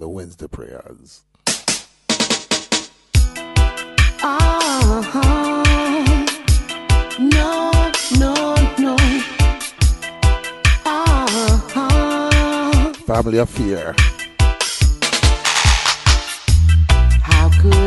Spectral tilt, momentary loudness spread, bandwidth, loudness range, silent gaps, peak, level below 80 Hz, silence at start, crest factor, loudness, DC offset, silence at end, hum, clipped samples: -4.5 dB/octave; 6 LU; 12 kHz; 3 LU; none; 0 dBFS; -18 dBFS; 0 s; 14 dB; -16 LUFS; under 0.1%; 0 s; none; under 0.1%